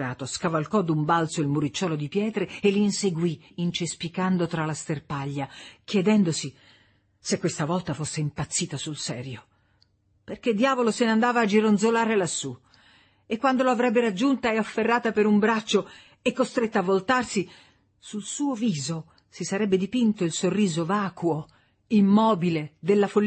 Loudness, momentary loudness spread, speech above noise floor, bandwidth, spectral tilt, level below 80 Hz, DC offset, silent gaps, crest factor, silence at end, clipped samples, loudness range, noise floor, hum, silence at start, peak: -25 LUFS; 11 LU; 41 dB; 8.8 kHz; -5 dB/octave; -62 dBFS; under 0.1%; none; 16 dB; 0 s; under 0.1%; 5 LU; -65 dBFS; none; 0 s; -8 dBFS